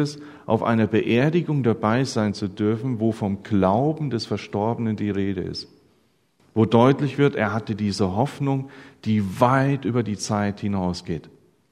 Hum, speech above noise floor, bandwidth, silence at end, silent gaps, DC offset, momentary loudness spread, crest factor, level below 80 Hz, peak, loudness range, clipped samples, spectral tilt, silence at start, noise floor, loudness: none; 42 dB; 12.5 kHz; 0.45 s; none; under 0.1%; 10 LU; 22 dB; -58 dBFS; 0 dBFS; 2 LU; under 0.1%; -7 dB/octave; 0 s; -63 dBFS; -23 LUFS